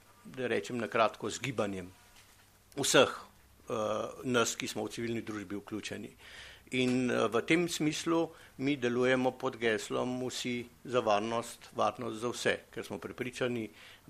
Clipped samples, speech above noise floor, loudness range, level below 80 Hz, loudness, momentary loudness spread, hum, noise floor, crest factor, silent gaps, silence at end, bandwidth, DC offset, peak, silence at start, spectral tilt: under 0.1%; 29 dB; 4 LU; -68 dBFS; -33 LUFS; 13 LU; none; -62 dBFS; 24 dB; none; 0.15 s; 15 kHz; under 0.1%; -10 dBFS; 0.25 s; -4 dB/octave